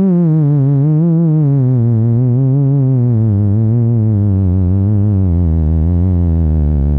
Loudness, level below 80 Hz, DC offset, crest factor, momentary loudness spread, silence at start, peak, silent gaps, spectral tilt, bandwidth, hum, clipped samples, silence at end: -12 LUFS; -22 dBFS; under 0.1%; 6 dB; 2 LU; 0 s; -6 dBFS; none; -14 dB/octave; 2.3 kHz; none; under 0.1%; 0 s